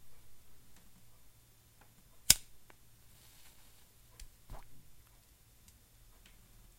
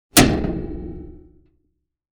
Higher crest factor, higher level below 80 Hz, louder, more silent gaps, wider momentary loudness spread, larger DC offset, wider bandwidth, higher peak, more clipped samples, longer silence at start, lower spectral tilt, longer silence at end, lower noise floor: first, 42 dB vs 22 dB; second, -58 dBFS vs -34 dBFS; second, -28 LUFS vs -19 LUFS; neither; first, 31 LU vs 24 LU; neither; second, 16 kHz vs 19.5 kHz; about the same, -2 dBFS vs 0 dBFS; neither; second, 0 s vs 0.15 s; second, 0.5 dB/octave vs -3.5 dB/octave; second, 0.1 s vs 1 s; second, -63 dBFS vs -71 dBFS